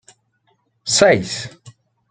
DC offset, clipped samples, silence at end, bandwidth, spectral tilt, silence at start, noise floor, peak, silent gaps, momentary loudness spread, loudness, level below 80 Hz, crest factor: under 0.1%; under 0.1%; 0.4 s; 9.6 kHz; -3 dB/octave; 0.85 s; -64 dBFS; -2 dBFS; none; 18 LU; -16 LUFS; -56 dBFS; 18 dB